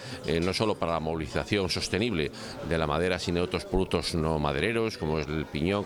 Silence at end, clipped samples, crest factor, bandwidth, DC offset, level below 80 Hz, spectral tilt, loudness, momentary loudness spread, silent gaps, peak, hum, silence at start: 0 s; under 0.1%; 18 dB; 17.5 kHz; under 0.1%; -44 dBFS; -5.5 dB/octave; -29 LUFS; 4 LU; none; -10 dBFS; none; 0 s